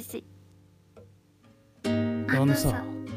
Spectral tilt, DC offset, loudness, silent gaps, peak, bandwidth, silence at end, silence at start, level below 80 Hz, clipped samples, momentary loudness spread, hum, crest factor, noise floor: -6 dB/octave; under 0.1%; -27 LUFS; none; -10 dBFS; 15.5 kHz; 0 s; 0 s; -48 dBFS; under 0.1%; 15 LU; none; 18 dB; -59 dBFS